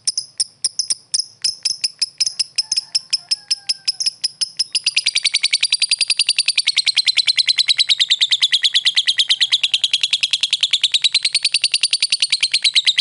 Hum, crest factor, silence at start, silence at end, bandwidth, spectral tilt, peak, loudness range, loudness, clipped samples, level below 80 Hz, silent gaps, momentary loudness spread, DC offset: none; 16 dB; 0.05 s; 0 s; 12 kHz; 5 dB/octave; -2 dBFS; 5 LU; -15 LUFS; under 0.1%; -72 dBFS; none; 7 LU; under 0.1%